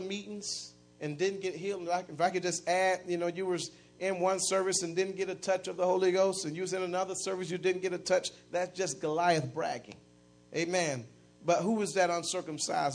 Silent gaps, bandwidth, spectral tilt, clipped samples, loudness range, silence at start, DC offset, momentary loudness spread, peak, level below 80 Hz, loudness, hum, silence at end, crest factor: none; 10.5 kHz; -3.5 dB/octave; under 0.1%; 2 LU; 0 s; under 0.1%; 9 LU; -14 dBFS; -74 dBFS; -32 LUFS; 60 Hz at -60 dBFS; 0 s; 18 dB